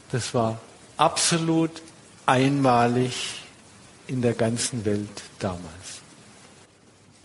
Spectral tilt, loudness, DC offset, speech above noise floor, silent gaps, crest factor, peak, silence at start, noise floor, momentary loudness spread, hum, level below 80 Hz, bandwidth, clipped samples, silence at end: -4.5 dB/octave; -24 LUFS; under 0.1%; 31 dB; none; 22 dB; -4 dBFS; 0.1 s; -55 dBFS; 19 LU; none; -56 dBFS; 11.5 kHz; under 0.1%; 1.25 s